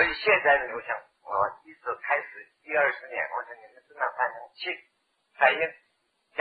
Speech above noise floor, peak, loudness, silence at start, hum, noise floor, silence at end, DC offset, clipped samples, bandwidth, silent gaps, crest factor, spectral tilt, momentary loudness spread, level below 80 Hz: 46 dB; -6 dBFS; -27 LUFS; 0 s; none; -73 dBFS; 0 s; under 0.1%; under 0.1%; 4.9 kHz; none; 24 dB; -5.5 dB/octave; 16 LU; -64 dBFS